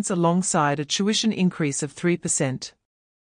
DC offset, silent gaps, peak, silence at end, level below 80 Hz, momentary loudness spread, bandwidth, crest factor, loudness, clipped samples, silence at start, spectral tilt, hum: under 0.1%; none; -8 dBFS; 0.7 s; -64 dBFS; 6 LU; 10.5 kHz; 16 dB; -23 LUFS; under 0.1%; 0 s; -4 dB/octave; none